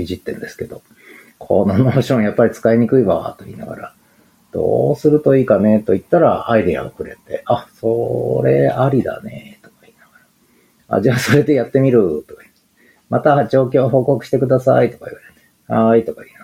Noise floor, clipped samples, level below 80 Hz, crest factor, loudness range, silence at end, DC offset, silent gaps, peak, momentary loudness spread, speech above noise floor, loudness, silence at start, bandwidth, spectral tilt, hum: -55 dBFS; under 0.1%; -52 dBFS; 16 dB; 3 LU; 0.2 s; under 0.1%; none; 0 dBFS; 17 LU; 40 dB; -15 LUFS; 0 s; 16 kHz; -7.5 dB/octave; none